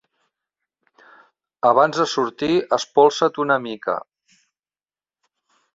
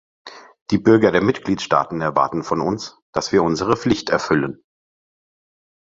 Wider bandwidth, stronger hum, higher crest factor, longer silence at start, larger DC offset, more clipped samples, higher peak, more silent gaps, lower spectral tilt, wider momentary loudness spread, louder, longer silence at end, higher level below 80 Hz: about the same, 7.8 kHz vs 7.8 kHz; neither; about the same, 22 dB vs 18 dB; first, 1.65 s vs 0.25 s; neither; neither; about the same, 0 dBFS vs -2 dBFS; second, none vs 0.61-0.66 s, 3.02-3.13 s; about the same, -4.5 dB/octave vs -5.5 dB/octave; about the same, 10 LU vs 11 LU; about the same, -19 LUFS vs -19 LUFS; first, 1.75 s vs 1.3 s; second, -64 dBFS vs -50 dBFS